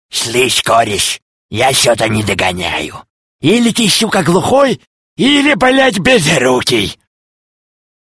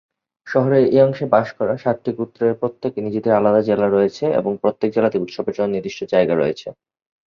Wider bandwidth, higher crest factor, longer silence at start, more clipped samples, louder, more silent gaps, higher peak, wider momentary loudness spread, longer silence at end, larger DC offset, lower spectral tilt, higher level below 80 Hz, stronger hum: first, 11 kHz vs 7 kHz; about the same, 12 dB vs 16 dB; second, 0.15 s vs 0.45 s; neither; first, -11 LUFS vs -19 LUFS; first, 1.22-1.49 s, 3.10-3.39 s, 4.87-5.16 s vs none; about the same, 0 dBFS vs -2 dBFS; about the same, 8 LU vs 8 LU; first, 1.2 s vs 0.55 s; neither; second, -3.5 dB/octave vs -8 dB/octave; first, -42 dBFS vs -58 dBFS; neither